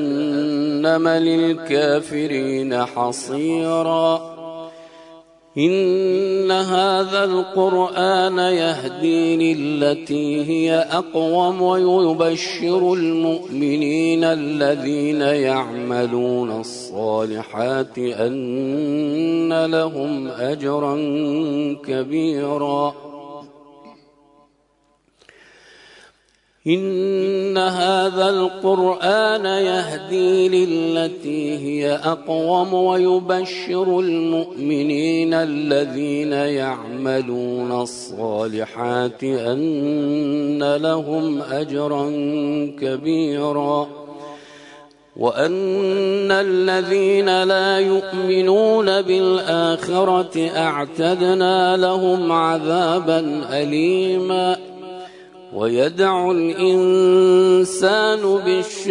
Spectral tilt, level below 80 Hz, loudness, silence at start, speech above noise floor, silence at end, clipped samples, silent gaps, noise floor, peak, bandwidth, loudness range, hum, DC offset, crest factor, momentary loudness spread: -5.5 dB/octave; -66 dBFS; -19 LUFS; 0 s; 43 dB; 0 s; under 0.1%; none; -62 dBFS; -4 dBFS; 11 kHz; 6 LU; none; under 0.1%; 14 dB; 8 LU